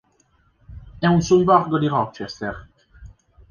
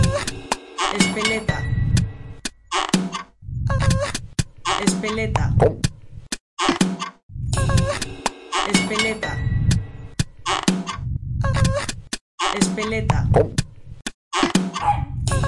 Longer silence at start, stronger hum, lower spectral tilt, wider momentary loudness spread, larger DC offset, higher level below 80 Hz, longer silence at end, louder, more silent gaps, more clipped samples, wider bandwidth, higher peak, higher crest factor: first, 0.7 s vs 0 s; neither; first, -6.5 dB/octave vs -4.5 dB/octave; about the same, 15 LU vs 13 LU; neither; second, -46 dBFS vs -32 dBFS; first, 0.45 s vs 0 s; about the same, -20 LUFS vs -22 LUFS; second, none vs 6.40-6.57 s, 7.23-7.29 s, 12.21-12.38 s, 14.14-14.31 s; neither; second, 7 kHz vs 11.5 kHz; about the same, -4 dBFS vs -2 dBFS; about the same, 18 dB vs 20 dB